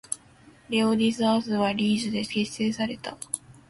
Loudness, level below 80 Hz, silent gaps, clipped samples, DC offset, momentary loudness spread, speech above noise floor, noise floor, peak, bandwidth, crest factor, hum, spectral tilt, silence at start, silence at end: -26 LUFS; -62 dBFS; none; under 0.1%; under 0.1%; 11 LU; 29 dB; -54 dBFS; -10 dBFS; 11.5 kHz; 16 dB; none; -4.5 dB/octave; 0.1 s; 0.15 s